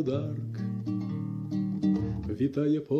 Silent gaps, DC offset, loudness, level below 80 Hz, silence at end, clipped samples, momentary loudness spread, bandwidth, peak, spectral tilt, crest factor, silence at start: none; under 0.1%; -31 LUFS; -52 dBFS; 0 s; under 0.1%; 6 LU; 6.8 kHz; -16 dBFS; -9.5 dB/octave; 14 dB; 0 s